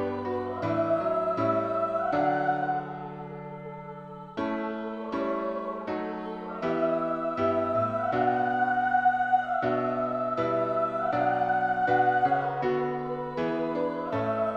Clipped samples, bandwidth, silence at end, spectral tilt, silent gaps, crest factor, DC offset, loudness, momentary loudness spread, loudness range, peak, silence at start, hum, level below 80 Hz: under 0.1%; 7 kHz; 0 s; -8 dB/octave; none; 14 dB; under 0.1%; -28 LUFS; 11 LU; 7 LU; -12 dBFS; 0 s; none; -62 dBFS